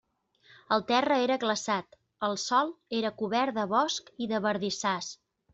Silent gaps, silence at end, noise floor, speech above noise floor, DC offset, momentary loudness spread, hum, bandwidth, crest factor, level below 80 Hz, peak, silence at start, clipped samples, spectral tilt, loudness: none; 0.4 s; -63 dBFS; 34 dB; under 0.1%; 7 LU; none; 8.2 kHz; 18 dB; -72 dBFS; -12 dBFS; 0.7 s; under 0.1%; -3.5 dB/octave; -29 LUFS